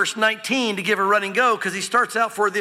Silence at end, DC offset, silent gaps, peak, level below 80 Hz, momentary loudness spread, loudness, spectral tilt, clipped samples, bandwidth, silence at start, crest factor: 0 s; under 0.1%; none; -6 dBFS; -72 dBFS; 3 LU; -20 LUFS; -2.5 dB/octave; under 0.1%; 16 kHz; 0 s; 14 dB